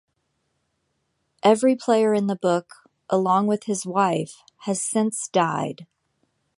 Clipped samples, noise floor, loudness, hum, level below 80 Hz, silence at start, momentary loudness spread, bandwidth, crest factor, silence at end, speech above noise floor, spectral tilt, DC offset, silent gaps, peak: under 0.1%; -73 dBFS; -22 LUFS; none; -72 dBFS; 1.45 s; 9 LU; 11.5 kHz; 20 dB; 0.75 s; 52 dB; -5 dB/octave; under 0.1%; none; -4 dBFS